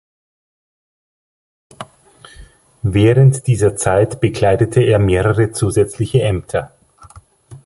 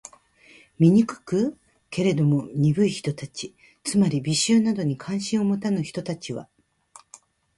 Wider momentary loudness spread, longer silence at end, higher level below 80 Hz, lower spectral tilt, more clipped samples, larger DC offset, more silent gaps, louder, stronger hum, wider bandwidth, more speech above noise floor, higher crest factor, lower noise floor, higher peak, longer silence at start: first, 17 LU vs 14 LU; second, 0.1 s vs 1.15 s; first, -36 dBFS vs -62 dBFS; about the same, -6.5 dB/octave vs -6 dB/octave; neither; neither; neither; first, -15 LUFS vs -23 LUFS; neither; about the same, 11.5 kHz vs 11.5 kHz; about the same, 31 dB vs 32 dB; about the same, 16 dB vs 18 dB; second, -44 dBFS vs -54 dBFS; first, 0 dBFS vs -6 dBFS; first, 1.8 s vs 0.8 s